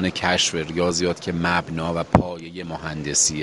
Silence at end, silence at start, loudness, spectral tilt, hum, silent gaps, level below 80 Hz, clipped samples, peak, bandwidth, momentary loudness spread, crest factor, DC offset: 0 s; 0 s; -22 LUFS; -3.5 dB/octave; none; none; -44 dBFS; under 0.1%; -2 dBFS; 11.5 kHz; 11 LU; 22 dB; under 0.1%